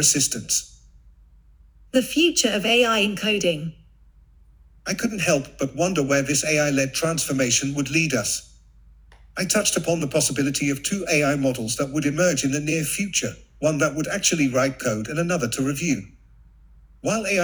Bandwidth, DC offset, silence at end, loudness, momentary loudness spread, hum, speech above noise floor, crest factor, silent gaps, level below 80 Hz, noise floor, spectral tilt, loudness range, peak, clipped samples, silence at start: over 20 kHz; under 0.1%; 0 s; -22 LUFS; 7 LU; none; 30 dB; 18 dB; none; -50 dBFS; -52 dBFS; -3.5 dB/octave; 2 LU; -4 dBFS; under 0.1%; 0 s